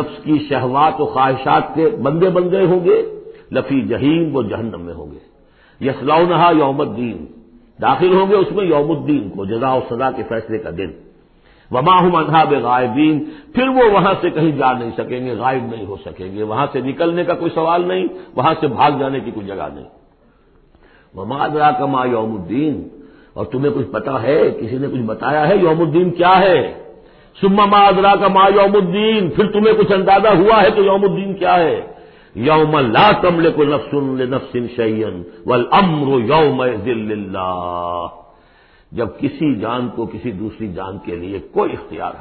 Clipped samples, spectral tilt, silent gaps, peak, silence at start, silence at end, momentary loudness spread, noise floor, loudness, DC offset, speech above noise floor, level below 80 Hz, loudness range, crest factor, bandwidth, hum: under 0.1%; -12 dB/octave; none; -2 dBFS; 0 s; 0 s; 15 LU; -52 dBFS; -15 LUFS; under 0.1%; 37 dB; -46 dBFS; 8 LU; 14 dB; 5 kHz; none